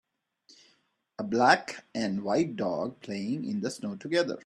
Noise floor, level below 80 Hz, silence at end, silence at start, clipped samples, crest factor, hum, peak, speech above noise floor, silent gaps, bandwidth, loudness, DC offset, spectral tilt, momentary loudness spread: -70 dBFS; -72 dBFS; 0.05 s; 1.2 s; under 0.1%; 24 dB; none; -6 dBFS; 41 dB; none; 12.5 kHz; -29 LUFS; under 0.1%; -5 dB/octave; 14 LU